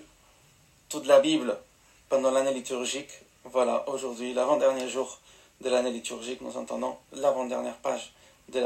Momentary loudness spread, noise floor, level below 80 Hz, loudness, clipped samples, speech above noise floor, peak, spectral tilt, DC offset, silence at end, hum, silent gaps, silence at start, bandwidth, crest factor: 14 LU; -60 dBFS; -70 dBFS; -28 LUFS; under 0.1%; 33 dB; -6 dBFS; -3 dB/octave; under 0.1%; 0 s; none; none; 0 s; 14 kHz; 22 dB